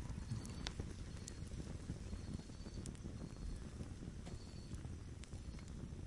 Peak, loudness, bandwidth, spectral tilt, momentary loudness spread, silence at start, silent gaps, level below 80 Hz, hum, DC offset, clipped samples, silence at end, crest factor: -22 dBFS; -50 LUFS; 11.5 kHz; -5.5 dB/octave; 5 LU; 0 s; none; -54 dBFS; none; under 0.1%; under 0.1%; 0 s; 28 dB